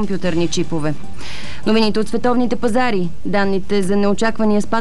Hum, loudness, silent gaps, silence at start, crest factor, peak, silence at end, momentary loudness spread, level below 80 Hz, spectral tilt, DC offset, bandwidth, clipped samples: none; -18 LUFS; none; 0 s; 14 dB; -4 dBFS; 0 s; 8 LU; -40 dBFS; -5.5 dB/octave; 10%; 12 kHz; under 0.1%